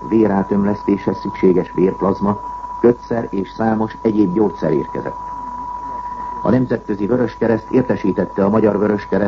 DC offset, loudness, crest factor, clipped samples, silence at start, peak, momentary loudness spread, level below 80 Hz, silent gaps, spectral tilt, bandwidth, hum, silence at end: under 0.1%; -18 LUFS; 16 dB; under 0.1%; 0 s; 0 dBFS; 11 LU; -42 dBFS; none; -9.5 dB/octave; 7 kHz; none; 0 s